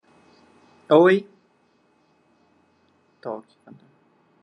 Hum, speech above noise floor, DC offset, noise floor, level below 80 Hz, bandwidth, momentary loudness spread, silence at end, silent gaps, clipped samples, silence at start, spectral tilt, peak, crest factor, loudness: none; 44 dB; under 0.1%; -63 dBFS; -80 dBFS; 8.4 kHz; 21 LU; 1 s; none; under 0.1%; 0.9 s; -7.5 dB/octave; -4 dBFS; 22 dB; -19 LUFS